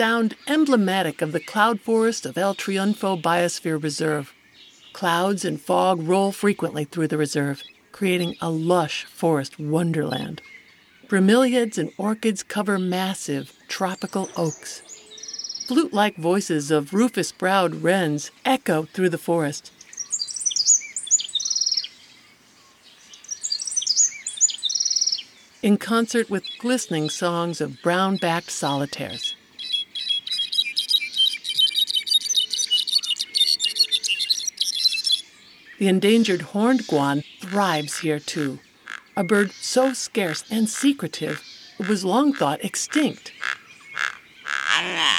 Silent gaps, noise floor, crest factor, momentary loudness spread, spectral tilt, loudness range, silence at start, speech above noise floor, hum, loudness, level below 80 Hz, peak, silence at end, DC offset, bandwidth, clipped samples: none; -54 dBFS; 20 dB; 11 LU; -3 dB/octave; 5 LU; 0 s; 32 dB; none; -22 LUFS; -72 dBFS; -2 dBFS; 0 s; under 0.1%; 17 kHz; under 0.1%